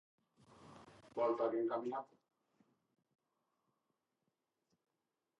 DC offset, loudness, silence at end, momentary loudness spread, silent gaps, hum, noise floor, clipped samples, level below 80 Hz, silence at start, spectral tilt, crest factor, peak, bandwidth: under 0.1%; -40 LUFS; 3.35 s; 24 LU; none; none; -89 dBFS; under 0.1%; -88 dBFS; 0.6 s; -7 dB/octave; 22 dB; -24 dBFS; 7.8 kHz